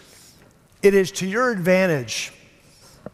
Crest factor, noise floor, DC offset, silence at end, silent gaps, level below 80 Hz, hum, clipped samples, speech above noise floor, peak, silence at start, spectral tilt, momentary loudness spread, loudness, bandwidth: 20 dB; -53 dBFS; under 0.1%; 0.85 s; none; -56 dBFS; none; under 0.1%; 34 dB; -4 dBFS; 0.85 s; -5 dB/octave; 10 LU; -20 LUFS; 15.5 kHz